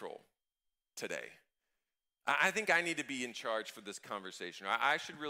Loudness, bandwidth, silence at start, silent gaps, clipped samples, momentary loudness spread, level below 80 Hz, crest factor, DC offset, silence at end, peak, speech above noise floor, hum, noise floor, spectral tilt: -36 LUFS; 16 kHz; 0 s; none; under 0.1%; 17 LU; -86 dBFS; 24 dB; under 0.1%; 0 s; -16 dBFS; 53 dB; none; -90 dBFS; -2 dB/octave